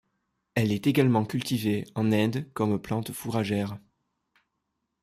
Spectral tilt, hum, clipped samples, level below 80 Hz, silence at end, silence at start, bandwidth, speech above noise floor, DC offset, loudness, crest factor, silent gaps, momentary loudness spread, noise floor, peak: -6.5 dB/octave; none; under 0.1%; -62 dBFS; 1.25 s; 0.55 s; 15 kHz; 54 dB; under 0.1%; -27 LUFS; 18 dB; none; 8 LU; -80 dBFS; -10 dBFS